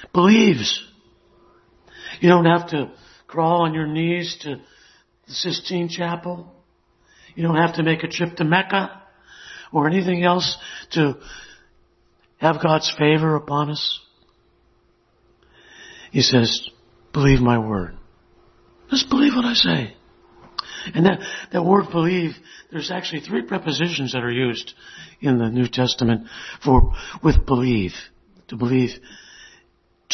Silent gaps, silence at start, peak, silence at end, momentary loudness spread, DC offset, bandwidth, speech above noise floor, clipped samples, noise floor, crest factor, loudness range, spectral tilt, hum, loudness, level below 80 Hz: none; 0 s; 0 dBFS; 0 s; 17 LU; under 0.1%; 6.4 kHz; 42 dB; under 0.1%; -61 dBFS; 20 dB; 4 LU; -5.5 dB/octave; none; -20 LUFS; -34 dBFS